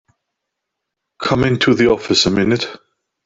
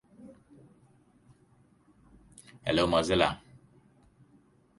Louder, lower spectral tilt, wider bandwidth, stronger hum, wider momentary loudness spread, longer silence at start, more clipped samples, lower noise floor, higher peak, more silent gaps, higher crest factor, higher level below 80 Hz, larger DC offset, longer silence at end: first, -15 LUFS vs -28 LUFS; about the same, -5 dB/octave vs -5 dB/octave; second, 7.8 kHz vs 11.5 kHz; neither; second, 8 LU vs 28 LU; first, 1.2 s vs 0.25 s; neither; first, -78 dBFS vs -64 dBFS; first, -2 dBFS vs -8 dBFS; neither; second, 16 dB vs 26 dB; first, -46 dBFS vs -54 dBFS; neither; second, 0.5 s vs 1.4 s